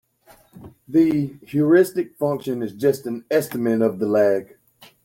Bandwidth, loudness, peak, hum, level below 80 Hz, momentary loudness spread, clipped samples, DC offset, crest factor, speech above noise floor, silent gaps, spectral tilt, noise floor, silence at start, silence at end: 17 kHz; -21 LUFS; -4 dBFS; none; -62 dBFS; 9 LU; under 0.1%; under 0.1%; 16 dB; 34 dB; none; -7 dB/octave; -54 dBFS; 0.55 s; 0.6 s